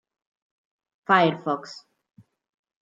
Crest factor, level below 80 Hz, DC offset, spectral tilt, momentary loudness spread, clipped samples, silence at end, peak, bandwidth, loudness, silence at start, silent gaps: 24 dB; -76 dBFS; under 0.1%; -6 dB/octave; 22 LU; under 0.1%; 1.1 s; -4 dBFS; 7.8 kHz; -22 LUFS; 1.1 s; none